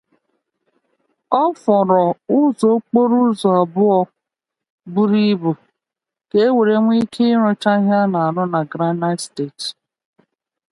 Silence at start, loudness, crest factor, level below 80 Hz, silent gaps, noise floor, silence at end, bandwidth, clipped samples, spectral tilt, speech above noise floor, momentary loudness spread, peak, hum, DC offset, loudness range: 1.3 s; -17 LUFS; 16 dB; -66 dBFS; 4.70-4.78 s; -86 dBFS; 1 s; 11.5 kHz; under 0.1%; -7 dB/octave; 71 dB; 10 LU; 0 dBFS; none; under 0.1%; 3 LU